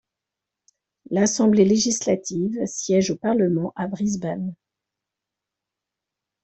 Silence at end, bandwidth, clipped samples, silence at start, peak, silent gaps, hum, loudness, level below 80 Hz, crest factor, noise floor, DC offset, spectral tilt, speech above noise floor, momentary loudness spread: 1.9 s; 8.4 kHz; under 0.1%; 1.1 s; -6 dBFS; none; none; -22 LUFS; -60 dBFS; 18 dB; -86 dBFS; under 0.1%; -5 dB/octave; 65 dB; 10 LU